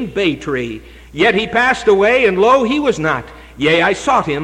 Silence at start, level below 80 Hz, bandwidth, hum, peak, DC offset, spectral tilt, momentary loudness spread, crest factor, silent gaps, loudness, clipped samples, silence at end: 0 s; -42 dBFS; 11 kHz; none; -2 dBFS; under 0.1%; -5 dB/octave; 10 LU; 12 dB; none; -14 LUFS; under 0.1%; 0 s